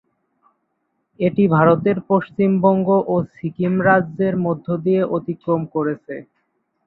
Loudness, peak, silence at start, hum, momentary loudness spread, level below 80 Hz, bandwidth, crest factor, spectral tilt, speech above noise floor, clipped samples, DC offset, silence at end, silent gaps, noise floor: -18 LUFS; -2 dBFS; 1.2 s; none; 9 LU; -58 dBFS; 4.2 kHz; 18 dB; -11.5 dB/octave; 54 dB; under 0.1%; under 0.1%; 0.65 s; none; -71 dBFS